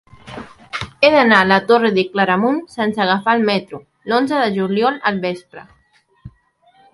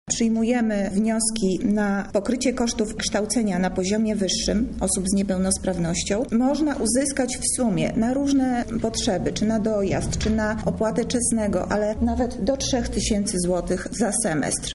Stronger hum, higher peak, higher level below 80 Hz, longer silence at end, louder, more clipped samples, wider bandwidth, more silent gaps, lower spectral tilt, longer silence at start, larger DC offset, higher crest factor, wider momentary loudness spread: neither; first, 0 dBFS vs -8 dBFS; second, -54 dBFS vs -38 dBFS; first, 0.65 s vs 0 s; first, -15 LUFS vs -23 LUFS; neither; about the same, 11.5 kHz vs 11.5 kHz; neither; first, -6 dB/octave vs -4.5 dB/octave; first, 0.25 s vs 0.05 s; neither; about the same, 18 dB vs 14 dB; first, 20 LU vs 3 LU